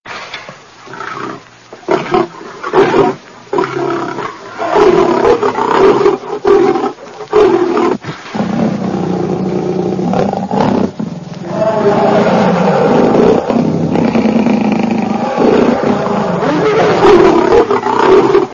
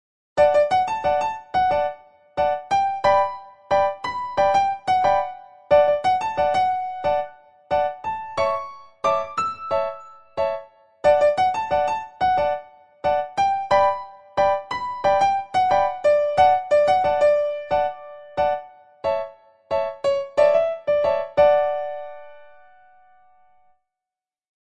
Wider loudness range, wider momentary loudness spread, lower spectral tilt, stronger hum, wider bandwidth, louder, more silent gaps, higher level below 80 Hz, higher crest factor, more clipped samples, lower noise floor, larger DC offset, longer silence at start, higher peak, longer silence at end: about the same, 5 LU vs 5 LU; about the same, 14 LU vs 12 LU; first, -7 dB/octave vs -4.5 dB/octave; neither; second, 7.4 kHz vs 9 kHz; first, -11 LUFS vs -21 LUFS; neither; first, -42 dBFS vs -54 dBFS; about the same, 12 dB vs 16 dB; neither; second, -35 dBFS vs -90 dBFS; second, under 0.1% vs 0.3%; second, 0.05 s vs 0.35 s; first, 0 dBFS vs -6 dBFS; second, 0 s vs 2.3 s